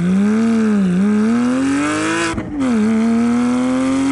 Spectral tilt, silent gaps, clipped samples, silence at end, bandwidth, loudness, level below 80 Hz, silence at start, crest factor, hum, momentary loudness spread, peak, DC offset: -6 dB/octave; none; under 0.1%; 0 s; 11.5 kHz; -16 LUFS; -44 dBFS; 0 s; 8 dB; none; 3 LU; -6 dBFS; under 0.1%